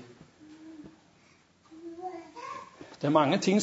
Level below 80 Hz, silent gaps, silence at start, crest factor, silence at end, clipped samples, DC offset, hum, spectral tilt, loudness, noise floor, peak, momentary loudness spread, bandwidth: -76 dBFS; none; 0 s; 22 dB; 0 s; under 0.1%; under 0.1%; none; -5.5 dB/octave; -30 LUFS; -62 dBFS; -10 dBFS; 26 LU; 8 kHz